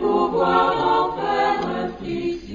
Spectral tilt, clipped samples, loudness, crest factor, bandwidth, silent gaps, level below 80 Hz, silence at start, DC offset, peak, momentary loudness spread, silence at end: -6.5 dB/octave; under 0.1%; -21 LUFS; 16 dB; 7.4 kHz; none; -48 dBFS; 0 s; under 0.1%; -6 dBFS; 9 LU; 0 s